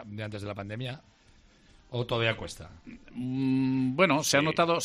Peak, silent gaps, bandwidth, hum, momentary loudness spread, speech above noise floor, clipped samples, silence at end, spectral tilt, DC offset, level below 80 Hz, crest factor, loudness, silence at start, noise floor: -10 dBFS; none; 13 kHz; none; 20 LU; 30 dB; under 0.1%; 0 s; -4.5 dB/octave; under 0.1%; -58 dBFS; 20 dB; -28 LUFS; 0 s; -59 dBFS